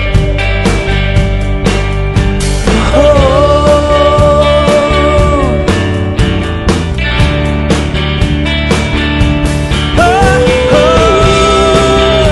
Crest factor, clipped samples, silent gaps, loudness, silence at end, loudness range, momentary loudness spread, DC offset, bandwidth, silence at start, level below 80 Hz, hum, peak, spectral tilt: 8 dB; 0.9%; none; -9 LUFS; 0 s; 4 LU; 5 LU; under 0.1%; 12 kHz; 0 s; -14 dBFS; none; 0 dBFS; -5.5 dB/octave